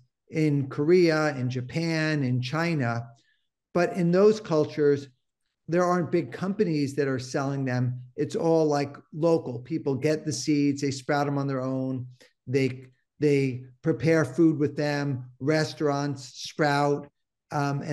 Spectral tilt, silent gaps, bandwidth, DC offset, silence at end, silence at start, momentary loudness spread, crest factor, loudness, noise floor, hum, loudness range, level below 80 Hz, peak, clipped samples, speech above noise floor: -6.5 dB/octave; none; 12.5 kHz; under 0.1%; 0 s; 0.3 s; 9 LU; 16 dB; -26 LUFS; -80 dBFS; none; 2 LU; -68 dBFS; -10 dBFS; under 0.1%; 55 dB